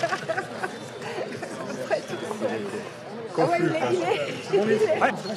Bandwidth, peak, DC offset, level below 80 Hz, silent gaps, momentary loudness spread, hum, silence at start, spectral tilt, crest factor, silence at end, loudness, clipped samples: 13.5 kHz; -8 dBFS; under 0.1%; -74 dBFS; none; 11 LU; none; 0 s; -5 dB/octave; 20 dB; 0 s; -27 LUFS; under 0.1%